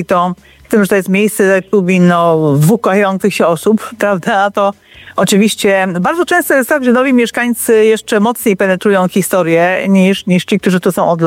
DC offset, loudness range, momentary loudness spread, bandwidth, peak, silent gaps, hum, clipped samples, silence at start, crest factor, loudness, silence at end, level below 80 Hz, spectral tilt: under 0.1%; 1 LU; 4 LU; 16.5 kHz; 0 dBFS; none; none; under 0.1%; 0 s; 10 dB; -11 LUFS; 0 s; -52 dBFS; -5.5 dB/octave